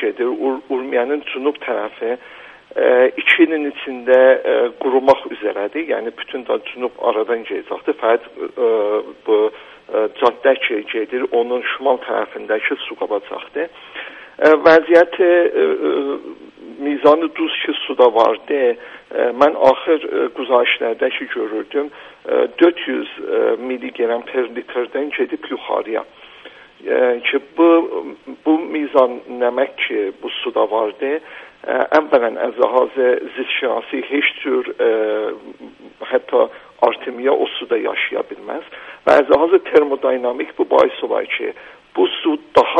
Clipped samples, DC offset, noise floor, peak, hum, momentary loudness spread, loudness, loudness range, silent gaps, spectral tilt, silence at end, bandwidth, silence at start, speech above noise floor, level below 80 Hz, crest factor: under 0.1%; under 0.1%; -41 dBFS; 0 dBFS; none; 13 LU; -17 LUFS; 5 LU; none; -5 dB/octave; 0 s; 6.4 kHz; 0 s; 24 dB; -62 dBFS; 18 dB